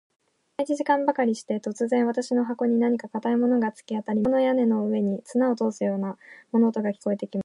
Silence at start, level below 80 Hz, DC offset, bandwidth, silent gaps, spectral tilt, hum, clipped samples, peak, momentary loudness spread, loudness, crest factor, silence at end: 0.6 s; -70 dBFS; under 0.1%; 11 kHz; none; -7 dB/octave; none; under 0.1%; -8 dBFS; 7 LU; -25 LUFS; 16 dB; 0 s